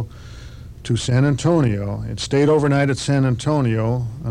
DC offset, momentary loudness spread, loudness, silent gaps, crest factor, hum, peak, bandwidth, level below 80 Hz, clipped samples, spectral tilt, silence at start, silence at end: under 0.1%; 19 LU; -19 LUFS; none; 12 dB; none; -6 dBFS; 11 kHz; -40 dBFS; under 0.1%; -6.5 dB/octave; 0 s; 0 s